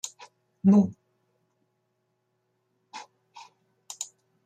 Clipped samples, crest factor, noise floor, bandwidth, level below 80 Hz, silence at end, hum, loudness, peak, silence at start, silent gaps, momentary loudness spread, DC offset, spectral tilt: under 0.1%; 20 dB; -76 dBFS; 9.6 kHz; -72 dBFS; 0.4 s; none; -25 LUFS; -10 dBFS; 0.05 s; none; 24 LU; under 0.1%; -6.5 dB/octave